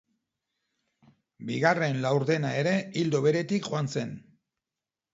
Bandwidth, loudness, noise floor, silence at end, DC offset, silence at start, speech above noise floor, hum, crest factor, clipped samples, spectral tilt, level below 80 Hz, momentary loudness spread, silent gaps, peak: 8 kHz; -27 LUFS; under -90 dBFS; 0.95 s; under 0.1%; 1.4 s; over 63 dB; none; 20 dB; under 0.1%; -6 dB/octave; -72 dBFS; 10 LU; none; -8 dBFS